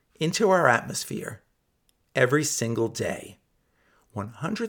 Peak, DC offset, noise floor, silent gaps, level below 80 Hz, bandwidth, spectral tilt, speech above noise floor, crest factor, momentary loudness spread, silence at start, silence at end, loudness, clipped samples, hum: -4 dBFS; under 0.1%; -70 dBFS; none; -64 dBFS; 19 kHz; -4 dB/octave; 45 dB; 22 dB; 17 LU; 0.2 s; 0 s; -25 LUFS; under 0.1%; none